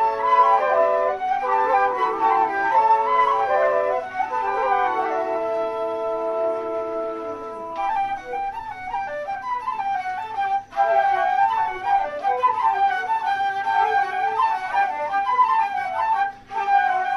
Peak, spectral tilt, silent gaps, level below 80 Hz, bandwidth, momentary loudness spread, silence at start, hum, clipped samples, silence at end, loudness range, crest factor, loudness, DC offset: -6 dBFS; -4 dB/octave; none; -56 dBFS; 11.5 kHz; 9 LU; 0 s; none; under 0.1%; 0 s; 7 LU; 14 dB; -21 LUFS; under 0.1%